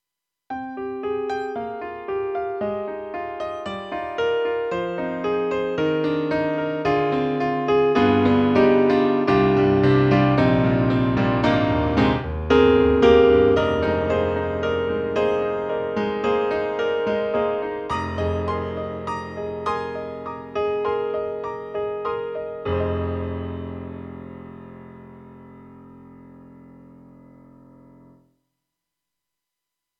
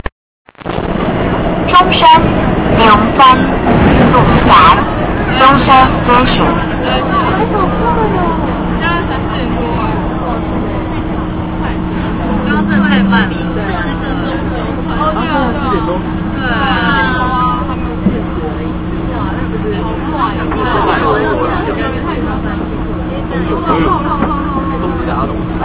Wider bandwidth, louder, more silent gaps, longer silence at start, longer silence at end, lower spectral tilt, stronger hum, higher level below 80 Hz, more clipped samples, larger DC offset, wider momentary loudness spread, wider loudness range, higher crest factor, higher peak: first, 7.4 kHz vs 4 kHz; second, -22 LUFS vs -12 LUFS; second, none vs 0.12-0.45 s; first, 0.5 s vs 0.05 s; first, 3.15 s vs 0 s; second, -8 dB/octave vs -10.5 dB/octave; neither; second, -42 dBFS vs -22 dBFS; second, under 0.1% vs 0.5%; neither; first, 14 LU vs 11 LU; first, 11 LU vs 8 LU; first, 18 dB vs 12 dB; second, -4 dBFS vs 0 dBFS